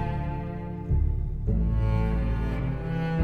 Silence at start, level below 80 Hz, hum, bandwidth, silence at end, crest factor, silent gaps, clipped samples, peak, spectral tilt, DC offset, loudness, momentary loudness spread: 0 s; -28 dBFS; none; 4.9 kHz; 0 s; 14 dB; none; under 0.1%; -12 dBFS; -9.5 dB/octave; under 0.1%; -29 LUFS; 7 LU